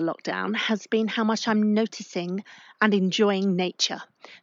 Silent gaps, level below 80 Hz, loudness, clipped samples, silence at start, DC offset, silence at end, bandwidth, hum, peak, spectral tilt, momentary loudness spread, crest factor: none; -82 dBFS; -25 LUFS; under 0.1%; 0 s; under 0.1%; 0.05 s; 7.6 kHz; none; -6 dBFS; -4.5 dB/octave; 9 LU; 18 dB